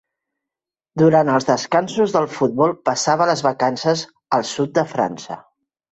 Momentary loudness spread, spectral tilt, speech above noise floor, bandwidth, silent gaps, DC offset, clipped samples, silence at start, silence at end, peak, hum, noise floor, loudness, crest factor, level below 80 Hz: 8 LU; -5 dB/octave; 70 dB; 8.2 kHz; none; under 0.1%; under 0.1%; 0.95 s; 0.55 s; -2 dBFS; none; -87 dBFS; -18 LUFS; 18 dB; -60 dBFS